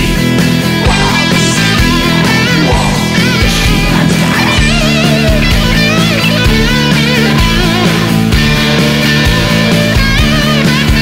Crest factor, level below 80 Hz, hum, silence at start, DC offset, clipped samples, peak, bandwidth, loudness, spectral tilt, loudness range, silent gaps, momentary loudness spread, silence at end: 8 dB; -18 dBFS; none; 0 s; under 0.1%; under 0.1%; 0 dBFS; 16.5 kHz; -9 LUFS; -4.5 dB/octave; 0 LU; none; 1 LU; 0 s